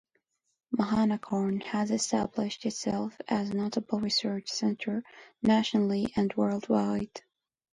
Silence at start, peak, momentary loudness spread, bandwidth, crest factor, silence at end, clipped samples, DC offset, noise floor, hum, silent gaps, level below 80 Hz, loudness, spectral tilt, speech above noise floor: 0.7 s; -14 dBFS; 7 LU; 10.5 kHz; 16 dB; 0.55 s; under 0.1%; under 0.1%; -76 dBFS; none; none; -62 dBFS; -30 LUFS; -5 dB/octave; 47 dB